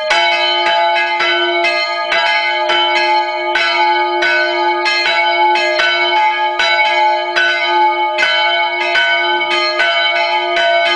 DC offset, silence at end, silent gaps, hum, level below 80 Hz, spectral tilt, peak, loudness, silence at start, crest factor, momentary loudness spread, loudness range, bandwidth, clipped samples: under 0.1%; 0 s; none; none; -62 dBFS; -0.5 dB/octave; 0 dBFS; -12 LUFS; 0 s; 14 dB; 2 LU; 1 LU; 10 kHz; under 0.1%